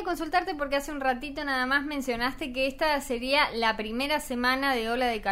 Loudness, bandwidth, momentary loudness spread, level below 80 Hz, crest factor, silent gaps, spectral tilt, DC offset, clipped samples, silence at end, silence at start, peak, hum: -27 LUFS; 16 kHz; 5 LU; -48 dBFS; 18 dB; none; -3 dB/octave; under 0.1%; under 0.1%; 0 s; 0 s; -10 dBFS; none